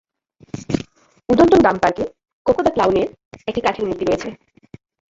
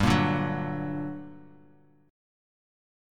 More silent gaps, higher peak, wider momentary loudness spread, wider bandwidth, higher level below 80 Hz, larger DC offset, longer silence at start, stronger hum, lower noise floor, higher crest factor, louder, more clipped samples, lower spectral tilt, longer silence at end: first, 2.33-2.45 s, 3.25-3.31 s vs none; first, -2 dBFS vs -8 dBFS; first, 20 LU vs 17 LU; second, 7.8 kHz vs 16 kHz; about the same, -44 dBFS vs -48 dBFS; neither; first, 0.55 s vs 0 s; second, none vs 50 Hz at -70 dBFS; second, -53 dBFS vs -59 dBFS; about the same, 18 dB vs 22 dB; first, -18 LUFS vs -29 LUFS; neither; about the same, -6 dB/octave vs -6.5 dB/octave; second, 0.8 s vs 1.65 s